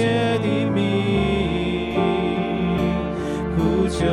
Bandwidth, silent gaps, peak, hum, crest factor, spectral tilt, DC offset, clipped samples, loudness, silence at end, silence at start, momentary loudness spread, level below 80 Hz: 11.5 kHz; none; -8 dBFS; none; 12 dB; -7 dB/octave; under 0.1%; under 0.1%; -21 LUFS; 0 s; 0 s; 3 LU; -36 dBFS